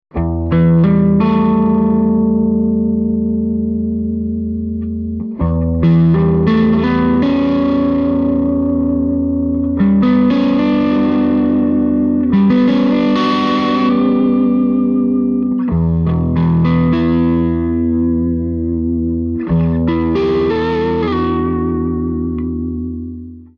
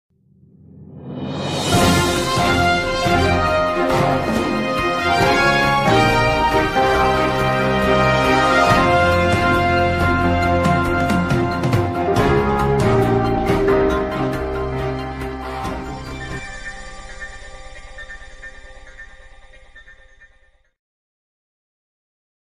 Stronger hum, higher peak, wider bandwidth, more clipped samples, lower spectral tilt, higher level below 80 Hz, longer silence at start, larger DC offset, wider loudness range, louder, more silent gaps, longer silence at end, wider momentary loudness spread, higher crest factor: neither; about the same, -2 dBFS vs -2 dBFS; second, 6 kHz vs 15.5 kHz; neither; first, -9.5 dB/octave vs -5.5 dB/octave; about the same, -30 dBFS vs -32 dBFS; second, 0.15 s vs 0.75 s; neither; second, 3 LU vs 16 LU; first, -14 LUFS vs -17 LUFS; neither; second, 0.15 s vs 2.65 s; second, 7 LU vs 19 LU; about the same, 12 dB vs 16 dB